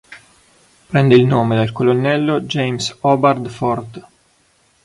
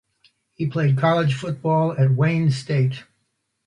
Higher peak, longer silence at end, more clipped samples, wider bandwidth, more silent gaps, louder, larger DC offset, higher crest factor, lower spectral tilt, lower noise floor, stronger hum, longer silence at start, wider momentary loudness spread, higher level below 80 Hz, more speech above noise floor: first, 0 dBFS vs -6 dBFS; first, 0.85 s vs 0.65 s; neither; first, 11.5 kHz vs 10 kHz; neither; first, -16 LUFS vs -21 LUFS; neither; about the same, 16 dB vs 16 dB; about the same, -6.5 dB/octave vs -7.5 dB/octave; second, -57 dBFS vs -73 dBFS; neither; second, 0.1 s vs 0.6 s; about the same, 9 LU vs 7 LU; first, -52 dBFS vs -60 dBFS; second, 42 dB vs 53 dB